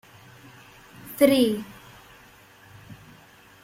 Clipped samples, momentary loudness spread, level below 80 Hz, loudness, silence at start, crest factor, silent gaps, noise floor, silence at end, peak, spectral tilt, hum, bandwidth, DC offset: under 0.1%; 29 LU; -62 dBFS; -22 LUFS; 1.05 s; 24 dB; none; -52 dBFS; 0.7 s; -4 dBFS; -4.5 dB/octave; none; 16.5 kHz; under 0.1%